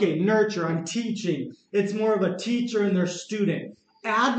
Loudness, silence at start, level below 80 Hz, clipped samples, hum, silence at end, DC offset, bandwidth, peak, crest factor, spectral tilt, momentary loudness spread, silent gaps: -26 LUFS; 0 s; -78 dBFS; under 0.1%; none; 0 s; under 0.1%; 8.8 kHz; -10 dBFS; 14 dB; -5.5 dB/octave; 7 LU; none